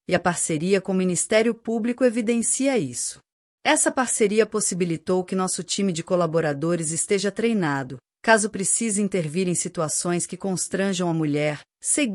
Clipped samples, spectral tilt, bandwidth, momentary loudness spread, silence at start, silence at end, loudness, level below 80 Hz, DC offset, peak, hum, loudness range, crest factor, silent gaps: under 0.1%; -4 dB/octave; 14 kHz; 6 LU; 0.1 s; 0 s; -23 LUFS; -64 dBFS; under 0.1%; -4 dBFS; none; 2 LU; 20 dB; 3.32-3.58 s